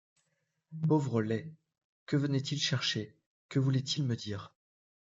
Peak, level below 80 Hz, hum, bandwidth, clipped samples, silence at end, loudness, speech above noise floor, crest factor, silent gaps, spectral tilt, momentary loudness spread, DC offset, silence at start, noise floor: -18 dBFS; -76 dBFS; none; 7.8 kHz; under 0.1%; 0.65 s; -32 LUFS; 48 dB; 16 dB; 1.84-2.07 s, 3.26-3.49 s; -5.5 dB/octave; 13 LU; under 0.1%; 0.7 s; -80 dBFS